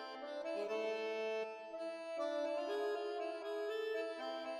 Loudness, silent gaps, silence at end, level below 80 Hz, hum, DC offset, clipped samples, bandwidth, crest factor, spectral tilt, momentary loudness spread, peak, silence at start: -42 LUFS; none; 0 s; -90 dBFS; none; under 0.1%; under 0.1%; 13 kHz; 12 dB; -3 dB/octave; 6 LU; -28 dBFS; 0 s